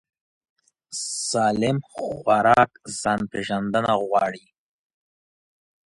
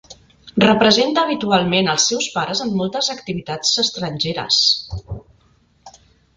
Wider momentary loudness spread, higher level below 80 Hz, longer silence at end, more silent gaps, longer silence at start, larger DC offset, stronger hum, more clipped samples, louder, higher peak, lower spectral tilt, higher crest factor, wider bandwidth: about the same, 12 LU vs 13 LU; second, -58 dBFS vs -46 dBFS; first, 1.55 s vs 0.5 s; neither; first, 0.9 s vs 0.1 s; neither; neither; neither; second, -22 LUFS vs -17 LUFS; about the same, -4 dBFS vs -2 dBFS; about the same, -4 dB/octave vs -3 dB/octave; about the same, 20 dB vs 18 dB; first, 11.5 kHz vs 9.6 kHz